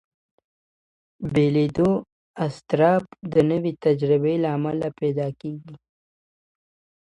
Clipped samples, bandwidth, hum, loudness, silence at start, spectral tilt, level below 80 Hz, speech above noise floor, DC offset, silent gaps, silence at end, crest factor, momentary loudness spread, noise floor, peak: under 0.1%; 10.5 kHz; none; -22 LUFS; 1.2 s; -8.5 dB/octave; -56 dBFS; over 68 dB; under 0.1%; 2.12-2.34 s; 1.3 s; 18 dB; 10 LU; under -90 dBFS; -6 dBFS